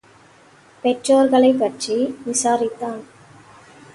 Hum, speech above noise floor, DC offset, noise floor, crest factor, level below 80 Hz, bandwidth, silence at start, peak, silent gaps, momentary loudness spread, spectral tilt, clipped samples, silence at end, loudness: none; 32 dB; under 0.1%; -50 dBFS; 16 dB; -64 dBFS; 11.5 kHz; 0.85 s; -4 dBFS; none; 13 LU; -3.5 dB/octave; under 0.1%; 0.9 s; -19 LUFS